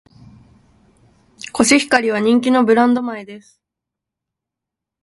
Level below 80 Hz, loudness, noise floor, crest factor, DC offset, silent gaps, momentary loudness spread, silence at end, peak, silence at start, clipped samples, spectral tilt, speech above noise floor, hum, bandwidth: -56 dBFS; -15 LUFS; -84 dBFS; 18 dB; under 0.1%; none; 18 LU; 1.65 s; 0 dBFS; 1.55 s; under 0.1%; -3.5 dB/octave; 69 dB; none; 11.5 kHz